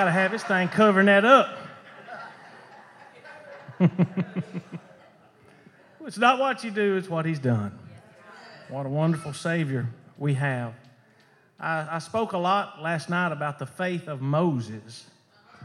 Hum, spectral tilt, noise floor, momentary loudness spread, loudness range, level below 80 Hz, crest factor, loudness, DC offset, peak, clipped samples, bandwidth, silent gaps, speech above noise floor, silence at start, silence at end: none; -6.5 dB/octave; -59 dBFS; 25 LU; 8 LU; -76 dBFS; 22 dB; -24 LUFS; under 0.1%; -4 dBFS; under 0.1%; 11.5 kHz; none; 35 dB; 0 s; 0 s